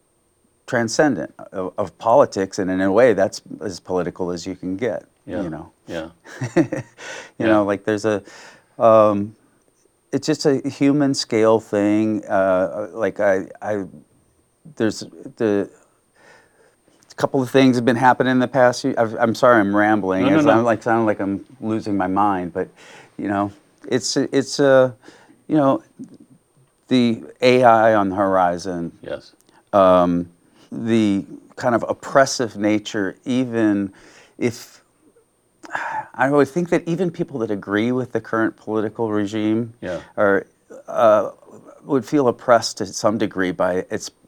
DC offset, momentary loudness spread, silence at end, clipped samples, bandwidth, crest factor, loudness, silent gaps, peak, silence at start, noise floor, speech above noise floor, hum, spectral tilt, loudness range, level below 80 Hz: under 0.1%; 15 LU; 0.2 s; under 0.1%; 14.5 kHz; 18 dB; -19 LUFS; none; 0 dBFS; 0.7 s; -63 dBFS; 44 dB; none; -5.5 dB/octave; 7 LU; -60 dBFS